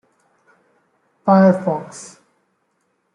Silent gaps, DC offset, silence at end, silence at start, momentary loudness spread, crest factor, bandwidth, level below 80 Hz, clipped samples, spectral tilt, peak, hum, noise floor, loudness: none; under 0.1%; 1.1 s; 1.25 s; 24 LU; 18 dB; 10.5 kHz; -66 dBFS; under 0.1%; -8 dB/octave; -2 dBFS; none; -68 dBFS; -16 LUFS